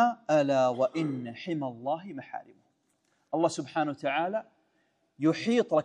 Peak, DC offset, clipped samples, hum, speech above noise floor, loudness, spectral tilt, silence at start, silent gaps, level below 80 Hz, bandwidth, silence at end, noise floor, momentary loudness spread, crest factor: -12 dBFS; under 0.1%; under 0.1%; none; 44 dB; -29 LUFS; -6 dB/octave; 0 s; none; -82 dBFS; 10.5 kHz; 0 s; -73 dBFS; 11 LU; 16 dB